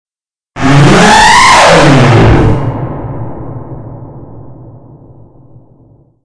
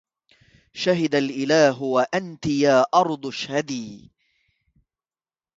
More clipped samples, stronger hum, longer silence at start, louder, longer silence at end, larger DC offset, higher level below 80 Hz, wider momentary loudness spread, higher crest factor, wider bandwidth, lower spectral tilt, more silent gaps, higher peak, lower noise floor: first, 2% vs under 0.1%; neither; second, 0.55 s vs 0.75 s; first, -5 LUFS vs -21 LUFS; second, 0.55 s vs 1.6 s; neither; first, -24 dBFS vs -62 dBFS; first, 23 LU vs 12 LU; second, 8 dB vs 20 dB; first, 11 kHz vs 7.8 kHz; about the same, -5 dB/octave vs -5 dB/octave; neither; first, 0 dBFS vs -4 dBFS; second, -81 dBFS vs under -90 dBFS